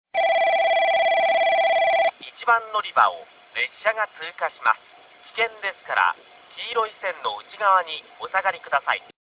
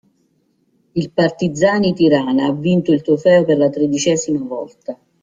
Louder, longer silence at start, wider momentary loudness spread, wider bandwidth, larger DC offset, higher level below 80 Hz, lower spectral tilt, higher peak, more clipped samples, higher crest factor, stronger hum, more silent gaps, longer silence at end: second, -22 LUFS vs -16 LUFS; second, 0.15 s vs 0.95 s; second, 11 LU vs 14 LU; second, 4 kHz vs 9.4 kHz; neither; second, -72 dBFS vs -56 dBFS; second, -4 dB/octave vs -5.5 dB/octave; about the same, -2 dBFS vs -2 dBFS; neither; first, 20 dB vs 14 dB; neither; neither; about the same, 0.2 s vs 0.3 s